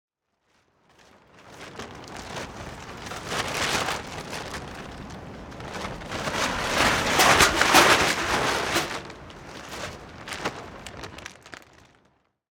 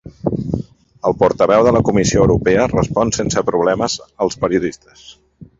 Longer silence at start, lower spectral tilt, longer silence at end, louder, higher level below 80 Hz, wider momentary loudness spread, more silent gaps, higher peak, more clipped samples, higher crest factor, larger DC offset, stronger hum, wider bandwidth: first, 1.4 s vs 0.05 s; second, -2 dB/octave vs -5.5 dB/octave; first, 0.95 s vs 0.15 s; second, -22 LUFS vs -16 LUFS; second, -48 dBFS vs -36 dBFS; first, 24 LU vs 10 LU; neither; about the same, -2 dBFS vs 0 dBFS; neither; first, 24 dB vs 16 dB; neither; neither; first, over 20 kHz vs 7.8 kHz